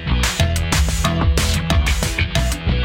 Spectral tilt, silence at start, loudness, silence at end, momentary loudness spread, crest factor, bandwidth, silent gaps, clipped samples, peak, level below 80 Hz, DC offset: -4 dB/octave; 0 s; -18 LUFS; 0 s; 2 LU; 14 dB; 17 kHz; none; under 0.1%; -2 dBFS; -20 dBFS; under 0.1%